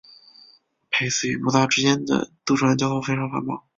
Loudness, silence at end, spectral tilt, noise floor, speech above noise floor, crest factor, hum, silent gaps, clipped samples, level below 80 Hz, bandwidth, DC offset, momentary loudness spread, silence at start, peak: -22 LUFS; 0.2 s; -4 dB/octave; -56 dBFS; 34 dB; 20 dB; none; none; under 0.1%; -60 dBFS; 7.8 kHz; under 0.1%; 6 LU; 0.9 s; -2 dBFS